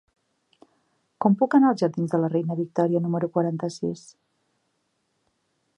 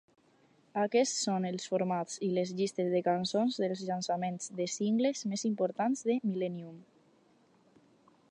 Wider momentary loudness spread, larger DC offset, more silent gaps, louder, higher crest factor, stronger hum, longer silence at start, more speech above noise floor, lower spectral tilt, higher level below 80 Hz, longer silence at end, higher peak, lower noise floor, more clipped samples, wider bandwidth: first, 10 LU vs 6 LU; neither; neither; first, -24 LUFS vs -32 LUFS; about the same, 20 dB vs 16 dB; neither; first, 1.2 s vs 0.75 s; first, 51 dB vs 35 dB; first, -8 dB/octave vs -5 dB/octave; first, -74 dBFS vs -84 dBFS; first, 1.8 s vs 1.5 s; first, -6 dBFS vs -18 dBFS; first, -73 dBFS vs -67 dBFS; neither; about the same, 10.5 kHz vs 10.5 kHz